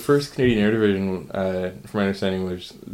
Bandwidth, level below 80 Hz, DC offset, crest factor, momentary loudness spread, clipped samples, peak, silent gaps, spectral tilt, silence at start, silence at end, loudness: 16 kHz; -48 dBFS; under 0.1%; 16 dB; 9 LU; under 0.1%; -6 dBFS; none; -6.5 dB/octave; 0 s; 0 s; -23 LUFS